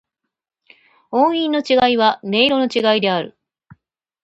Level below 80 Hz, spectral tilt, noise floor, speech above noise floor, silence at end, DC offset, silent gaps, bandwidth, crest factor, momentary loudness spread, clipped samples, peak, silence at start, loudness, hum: -60 dBFS; -5 dB/octave; -65 dBFS; 49 dB; 0.95 s; under 0.1%; none; 8.2 kHz; 18 dB; 7 LU; under 0.1%; 0 dBFS; 1.1 s; -16 LUFS; none